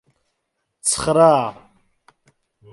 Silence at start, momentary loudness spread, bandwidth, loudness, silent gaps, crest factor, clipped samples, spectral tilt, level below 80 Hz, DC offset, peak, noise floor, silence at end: 0.85 s; 10 LU; 12 kHz; -17 LUFS; none; 20 dB; under 0.1%; -4 dB/octave; -52 dBFS; under 0.1%; -2 dBFS; -75 dBFS; 1.2 s